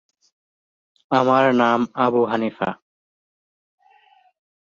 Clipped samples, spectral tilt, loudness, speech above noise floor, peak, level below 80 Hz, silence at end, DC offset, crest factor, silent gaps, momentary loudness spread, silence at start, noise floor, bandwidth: under 0.1%; -6.5 dB/octave; -19 LUFS; 38 dB; -2 dBFS; -66 dBFS; 2 s; under 0.1%; 20 dB; none; 12 LU; 1.1 s; -56 dBFS; 7.2 kHz